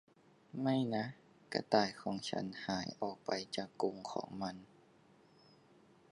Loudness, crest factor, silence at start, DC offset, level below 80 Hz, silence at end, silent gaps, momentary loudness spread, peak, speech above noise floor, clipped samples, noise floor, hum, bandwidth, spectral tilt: -39 LUFS; 26 dB; 0.55 s; under 0.1%; -76 dBFS; 1.45 s; none; 10 LU; -14 dBFS; 28 dB; under 0.1%; -66 dBFS; none; 11 kHz; -5 dB/octave